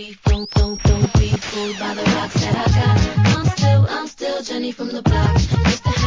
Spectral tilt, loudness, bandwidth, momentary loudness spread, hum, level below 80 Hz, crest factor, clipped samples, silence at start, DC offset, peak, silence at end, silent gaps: -6 dB/octave; -18 LUFS; 7.6 kHz; 9 LU; none; -24 dBFS; 14 dB; under 0.1%; 0 s; 0.2%; -2 dBFS; 0 s; none